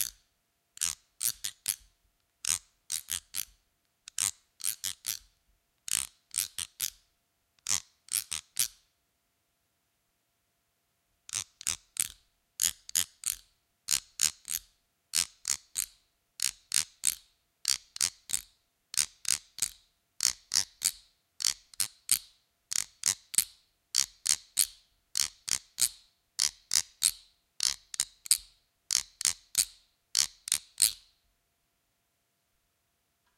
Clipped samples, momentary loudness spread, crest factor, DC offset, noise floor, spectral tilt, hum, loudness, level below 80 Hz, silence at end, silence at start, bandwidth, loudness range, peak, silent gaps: under 0.1%; 9 LU; 32 dB; under 0.1%; -77 dBFS; 2.5 dB/octave; none; -31 LUFS; -68 dBFS; 2.4 s; 0 s; 17 kHz; 6 LU; -2 dBFS; none